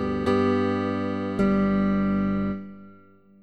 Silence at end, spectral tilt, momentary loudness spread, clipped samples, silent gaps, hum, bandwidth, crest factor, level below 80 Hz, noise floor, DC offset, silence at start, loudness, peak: 0.5 s; -8.5 dB/octave; 7 LU; under 0.1%; none; 50 Hz at -45 dBFS; 8.4 kHz; 14 dB; -44 dBFS; -53 dBFS; 0.2%; 0 s; -24 LUFS; -12 dBFS